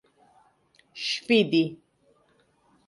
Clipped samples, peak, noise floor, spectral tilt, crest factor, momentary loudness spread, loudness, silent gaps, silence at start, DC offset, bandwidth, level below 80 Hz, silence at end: under 0.1%; -10 dBFS; -65 dBFS; -5 dB/octave; 20 dB; 12 LU; -25 LUFS; none; 0.95 s; under 0.1%; 11.5 kHz; -74 dBFS; 1.15 s